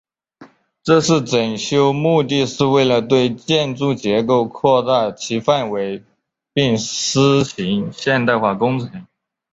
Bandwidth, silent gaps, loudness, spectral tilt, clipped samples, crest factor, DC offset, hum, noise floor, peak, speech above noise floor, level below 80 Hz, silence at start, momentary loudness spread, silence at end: 8 kHz; none; -17 LUFS; -5 dB/octave; under 0.1%; 16 dB; under 0.1%; none; -46 dBFS; -2 dBFS; 30 dB; -54 dBFS; 0.4 s; 7 LU; 0.5 s